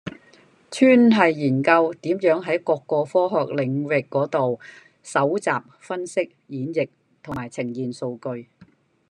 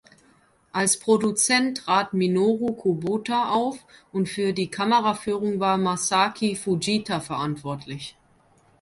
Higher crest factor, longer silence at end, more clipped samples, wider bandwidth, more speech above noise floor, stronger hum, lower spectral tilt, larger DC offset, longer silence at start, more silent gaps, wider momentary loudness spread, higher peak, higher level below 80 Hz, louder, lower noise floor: about the same, 20 dB vs 18 dB; about the same, 0.65 s vs 0.7 s; neither; second, 10.5 kHz vs 12 kHz; about the same, 33 dB vs 36 dB; neither; first, -6.5 dB/octave vs -4 dB/octave; neither; second, 0.05 s vs 0.75 s; neither; first, 16 LU vs 12 LU; first, -2 dBFS vs -6 dBFS; about the same, -66 dBFS vs -62 dBFS; about the same, -22 LUFS vs -23 LUFS; second, -54 dBFS vs -60 dBFS